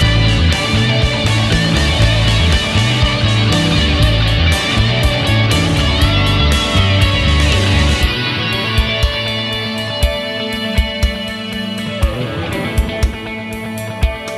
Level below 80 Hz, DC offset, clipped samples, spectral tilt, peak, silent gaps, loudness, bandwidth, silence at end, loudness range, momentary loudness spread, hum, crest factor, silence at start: -20 dBFS; under 0.1%; under 0.1%; -5 dB/octave; 0 dBFS; none; -14 LUFS; 13.5 kHz; 0 s; 6 LU; 7 LU; none; 14 dB; 0 s